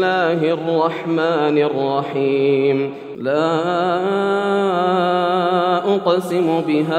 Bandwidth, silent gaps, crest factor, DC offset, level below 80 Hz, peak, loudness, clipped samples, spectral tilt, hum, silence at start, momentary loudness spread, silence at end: 14 kHz; none; 16 dB; under 0.1%; -70 dBFS; -2 dBFS; -18 LUFS; under 0.1%; -7 dB/octave; none; 0 s; 3 LU; 0 s